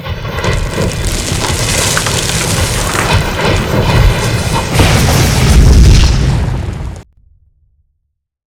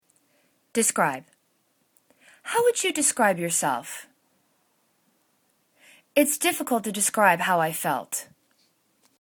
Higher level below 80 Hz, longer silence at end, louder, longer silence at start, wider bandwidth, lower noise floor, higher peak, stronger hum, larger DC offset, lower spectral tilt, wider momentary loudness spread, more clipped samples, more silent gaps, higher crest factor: first, -14 dBFS vs -74 dBFS; first, 1.5 s vs 0.95 s; first, -11 LUFS vs -23 LUFS; second, 0 s vs 0.75 s; about the same, 18.5 kHz vs 19 kHz; about the same, -67 dBFS vs -69 dBFS; first, 0 dBFS vs -4 dBFS; neither; neither; first, -4.5 dB/octave vs -2.5 dB/octave; second, 9 LU vs 12 LU; first, 0.6% vs under 0.1%; neither; second, 10 dB vs 22 dB